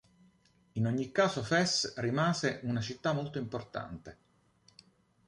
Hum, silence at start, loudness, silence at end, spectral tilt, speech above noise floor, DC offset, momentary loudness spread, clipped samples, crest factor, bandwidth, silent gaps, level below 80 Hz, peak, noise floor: none; 0.75 s; -32 LUFS; 1.15 s; -4.5 dB/octave; 35 dB; under 0.1%; 13 LU; under 0.1%; 20 dB; 11.5 kHz; none; -64 dBFS; -14 dBFS; -67 dBFS